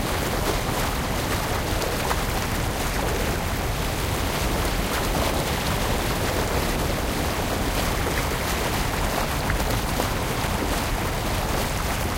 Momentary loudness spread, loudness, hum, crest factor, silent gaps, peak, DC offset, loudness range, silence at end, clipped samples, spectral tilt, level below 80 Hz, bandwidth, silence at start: 1 LU; -25 LUFS; none; 16 dB; none; -8 dBFS; under 0.1%; 1 LU; 0 s; under 0.1%; -4 dB/octave; -30 dBFS; 17 kHz; 0 s